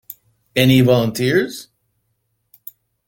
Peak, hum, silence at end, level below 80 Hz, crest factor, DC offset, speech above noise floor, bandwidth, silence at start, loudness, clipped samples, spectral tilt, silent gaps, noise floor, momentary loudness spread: -2 dBFS; none; 1.45 s; -50 dBFS; 18 dB; under 0.1%; 55 dB; 17 kHz; 0.1 s; -16 LUFS; under 0.1%; -6 dB/octave; none; -70 dBFS; 25 LU